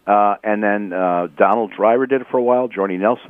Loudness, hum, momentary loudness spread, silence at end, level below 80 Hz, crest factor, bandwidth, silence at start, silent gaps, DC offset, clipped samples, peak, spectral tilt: -17 LUFS; none; 4 LU; 0 s; -70 dBFS; 16 dB; 3.7 kHz; 0.05 s; none; under 0.1%; under 0.1%; 0 dBFS; -9 dB/octave